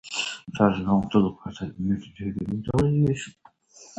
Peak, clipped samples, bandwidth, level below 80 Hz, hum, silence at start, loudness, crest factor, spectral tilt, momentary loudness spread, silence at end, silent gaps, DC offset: -6 dBFS; under 0.1%; 9.6 kHz; -48 dBFS; none; 0.05 s; -25 LUFS; 20 dB; -6.5 dB/octave; 12 LU; 0.1 s; none; under 0.1%